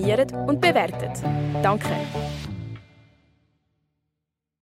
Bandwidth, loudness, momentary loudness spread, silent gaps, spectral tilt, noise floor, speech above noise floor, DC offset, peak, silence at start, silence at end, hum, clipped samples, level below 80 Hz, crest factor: 16 kHz; -24 LUFS; 15 LU; none; -6 dB/octave; -83 dBFS; 60 dB; under 0.1%; -6 dBFS; 0 s; 1.8 s; none; under 0.1%; -48 dBFS; 20 dB